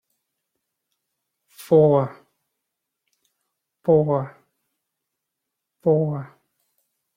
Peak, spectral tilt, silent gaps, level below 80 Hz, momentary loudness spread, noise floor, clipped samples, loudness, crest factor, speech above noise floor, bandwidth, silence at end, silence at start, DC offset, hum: -4 dBFS; -9.5 dB/octave; none; -64 dBFS; 16 LU; -82 dBFS; under 0.1%; -20 LUFS; 20 dB; 64 dB; 16 kHz; 0.9 s; 1.6 s; under 0.1%; none